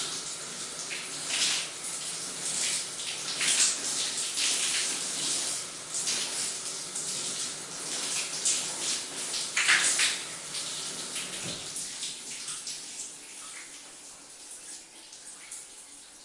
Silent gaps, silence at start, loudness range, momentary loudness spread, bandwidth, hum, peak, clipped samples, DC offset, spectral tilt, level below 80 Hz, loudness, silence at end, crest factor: none; 0 s; 11 LU; 18 LU; 11.5 kHz; none; -8 dBFS; under 0.1%; under 0.1%; 1 dB/octave; -74 dBFS; -29 LUFS; 0 s; 24 dB